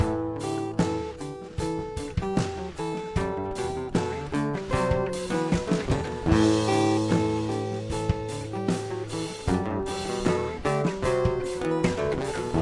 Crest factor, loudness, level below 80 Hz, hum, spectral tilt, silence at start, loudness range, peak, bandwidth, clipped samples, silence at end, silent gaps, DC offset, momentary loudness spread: 18 dB; -27 LUFS; -42 dBFS; none; -6 dB/octave; 0 s; 5 LU; -8 dBFS; 11.5 kHz; under 0.1%; 0 s; none; under 0.1%; 9 LU